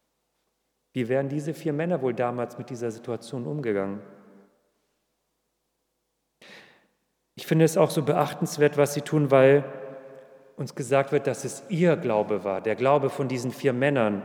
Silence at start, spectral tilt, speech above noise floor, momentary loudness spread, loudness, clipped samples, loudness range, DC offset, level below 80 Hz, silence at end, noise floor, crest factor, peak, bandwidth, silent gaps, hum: 0.95 s; -6.5 dB/octave; 53 dB; 14 LU; -25 LUFS; under 0.1%; 12 LU; under 0.1%; -80 dBFS; 0 s; -77 dBFS; 20 dB; -6 dBFS; 19 kHz; none; none